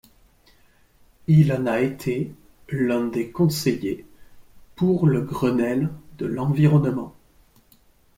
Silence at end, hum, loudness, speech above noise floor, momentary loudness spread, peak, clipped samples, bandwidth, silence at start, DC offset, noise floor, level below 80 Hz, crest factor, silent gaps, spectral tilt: 1.1 s; none; -22 LUFS; 36 dB; 14 LU; -6 dBFS; under 0.1%; 16 kHz; 1.3 s; under 0.1%; -57 dBFS; -54 dBFS; 18 dB; none; -7.5 dB/octave